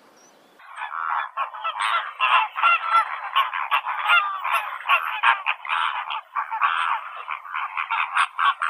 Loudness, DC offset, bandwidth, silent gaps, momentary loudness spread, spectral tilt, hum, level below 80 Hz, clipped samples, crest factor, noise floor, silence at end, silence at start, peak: -22 LUFS; under 0.1%; 15 kHz; none; 10 LU; 2 dB/octave; none; -78 dBFS; under 0.1%; 20 dB; -53 dBFS; 0 s; 0.6 s; -4 dBFS